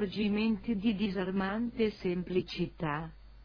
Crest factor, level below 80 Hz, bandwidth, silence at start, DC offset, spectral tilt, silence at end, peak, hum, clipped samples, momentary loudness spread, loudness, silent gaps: 14 dB; -54 dBFS; 5.4 kHz; 0 s; under 0.1%; -8 dB/octave; 0 s; -18 dBFS; none; under 0.1%; 5 LU; -33 LUFS; none